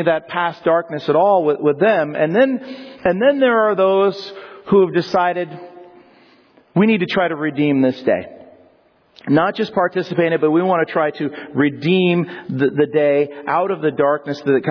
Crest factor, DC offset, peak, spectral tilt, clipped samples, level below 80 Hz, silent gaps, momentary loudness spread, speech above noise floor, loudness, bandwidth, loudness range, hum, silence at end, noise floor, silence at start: 14 dB; under 0.1%; -4 dBFS; -8 dB/octave; under 0.1%; -60 dBFS; none; 9 LU; 38 dB; -17 LUFS; 5.4 kHz; 3 LU; none; 0 s; -54 dBFS; 0 s